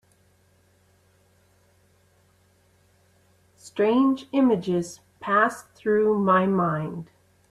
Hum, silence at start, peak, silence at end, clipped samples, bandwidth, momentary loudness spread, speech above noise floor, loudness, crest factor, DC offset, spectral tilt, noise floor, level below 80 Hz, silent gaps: none; 3.65 s; -8 dBFS; 0.45 s; under 0.1%; 13 kHz; 15 LU; 39 dB; -23 LUFS; 18 dB; under 0.1%; -7 dB/octave; -62 dBFS; -66 dBFS; none